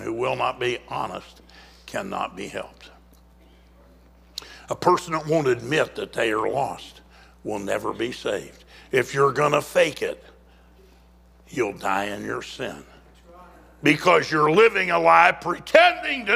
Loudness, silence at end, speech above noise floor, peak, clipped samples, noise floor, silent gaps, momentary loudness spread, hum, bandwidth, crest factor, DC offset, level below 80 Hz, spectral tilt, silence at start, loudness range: -22 LUFS; 0 s; 31 dB; 0 dBFS; under 0.1%; -53 dBFS; none; 18 LU; none; 16 kHz; 24 dB; under 0.1%; -54 dBFS; -4.5 dB/octave; 0 s; 12 LU